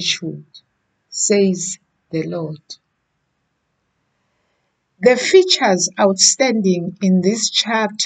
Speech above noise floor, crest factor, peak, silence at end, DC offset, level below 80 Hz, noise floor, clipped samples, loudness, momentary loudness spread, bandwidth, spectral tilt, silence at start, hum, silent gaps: 54 dB; 18 dB; 0 dBFS; 0 s; under 0.1%; -64 dBFS; -70 dBFS; under 0.1%; -16 LUFS; 17 LU; 9.4 kHz; -3 dB/octave; 0 s; none; none